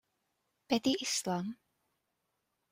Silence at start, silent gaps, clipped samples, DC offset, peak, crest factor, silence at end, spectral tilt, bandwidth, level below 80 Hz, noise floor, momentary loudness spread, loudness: 0.7 s; none; under 0.1%; under 0.1%; -16 dBFS; 22 dB; 1.15 s; -3.5 dB/octave; 16 kHz; -76 dBFS; -83 dBFS; 12 LU; -34 LUFS